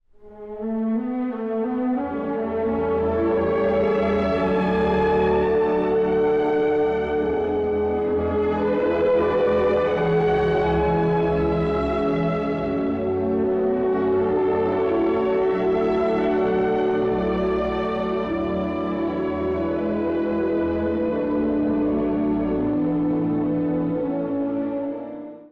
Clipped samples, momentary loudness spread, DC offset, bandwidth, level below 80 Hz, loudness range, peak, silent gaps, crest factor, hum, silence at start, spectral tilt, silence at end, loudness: under 0.1%; 5 LU; under 0.1%; 6.2 kHz; -42 dBFS; 3 LU; -12 dBFS; none; 8 dB; none; 0.2 s; -9 dB/octave; 0.05 s; -22 LUFS